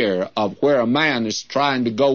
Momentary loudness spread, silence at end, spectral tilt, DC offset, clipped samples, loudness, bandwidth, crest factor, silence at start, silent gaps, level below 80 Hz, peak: 6 LU; 0 s; -4.5 dB/octave; 0.2%; under 0.1%; -19 LUFS; 7.2 kHz; 14 dB; 0 s; none; -64 dBFS; -4 dBFS